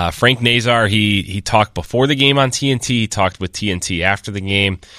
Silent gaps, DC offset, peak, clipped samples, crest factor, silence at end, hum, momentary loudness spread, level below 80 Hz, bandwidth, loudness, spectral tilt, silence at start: none; under 0.1%; 0 dBFS; under 0.1%; 16 dB; 0 s; none; 7 LU; -40 dBFS; 15 kHz; -15 LUFS; -4 dB/octave; 0 s